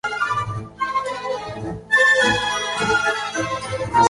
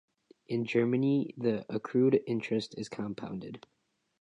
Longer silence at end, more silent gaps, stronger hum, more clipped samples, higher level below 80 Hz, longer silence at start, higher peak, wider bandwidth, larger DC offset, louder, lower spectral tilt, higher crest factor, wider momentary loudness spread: second, 0 s vs 0.6 s; neither; neither; neither; first, -48 dBFS vs -72 dBFS; second, 0.05 s vs 0.5 s; first, -4 dBFS vs -14 dBFS; about the same, 11.5 kHz vs 10.5 kHz; neither; first, -20 LUFS vs -31 LUFS; second, -3 dB/octave vs -7.5 dB/octave; about the same, 16 dB vs 18 dB; about the same, 13 LU vs 13 LU